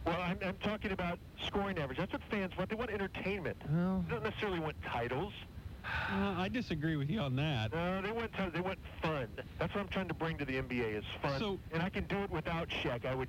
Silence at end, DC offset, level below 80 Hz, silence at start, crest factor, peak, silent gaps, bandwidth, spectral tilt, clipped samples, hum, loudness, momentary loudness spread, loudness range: 0 s; under 0.1%; -52 dBFS; 0 s; 14 dB; -22 dBFS; none; 16 kHz; -7 dB/octave; under 0.1%; none; -37 LUFS; 5 LU; 2 LU